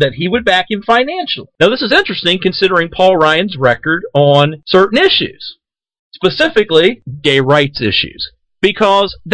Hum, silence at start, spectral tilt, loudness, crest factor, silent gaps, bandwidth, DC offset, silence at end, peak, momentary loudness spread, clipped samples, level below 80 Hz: none; 0 s; -5.5 dB/octave; -12 LUFS; 12 dB; 5.99-6.11 s; 9.4 kHz; under 0.1%; 0 s; 0 dBFS; 7 LU; 0.2%; -44 dBFS